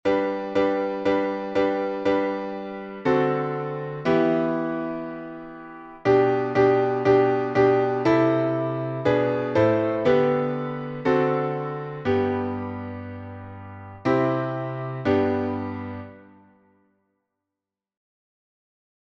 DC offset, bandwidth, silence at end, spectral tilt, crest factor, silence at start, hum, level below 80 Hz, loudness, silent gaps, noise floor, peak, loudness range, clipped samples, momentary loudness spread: under 0.1%; 7 kHz; 2.8 s; -8 dB/octave; 18 dB; 0.05 s; none; -60 dBFS; -23 LUFS; none; -87 dBFS; -6 dBFS; 6 LU; under 0.1%; 16 LU